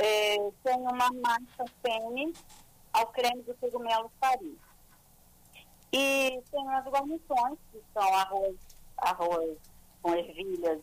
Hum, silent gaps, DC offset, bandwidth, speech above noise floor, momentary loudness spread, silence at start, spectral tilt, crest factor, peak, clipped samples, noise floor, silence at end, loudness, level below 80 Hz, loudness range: 60 Hz at -70 dBFS; none; under 0.1%; 15.5 kHz; 29 dB; 11 LU; 0 s; -2 dB/octave; 14 dB; -16 dBFS; under 0.1%; -59 dBFS; 0 s; -30 LUFS; -60 dBFS; 3 LU